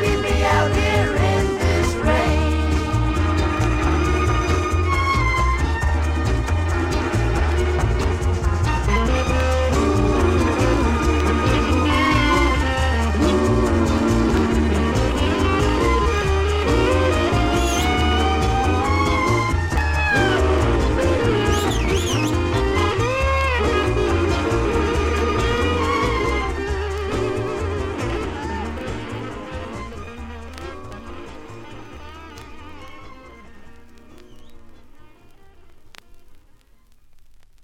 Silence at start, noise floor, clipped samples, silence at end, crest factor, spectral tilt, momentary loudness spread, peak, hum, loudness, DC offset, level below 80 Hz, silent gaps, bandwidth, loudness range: 0 s; -50 dBFS; under 0.1%; 0.25 s; 14 dB; -6 dB/octave; 14 LU; -4 dBFS; none; -19 LUFS; under 0.1%; -26 dBFS; none; 14.5 kHz; 12 LU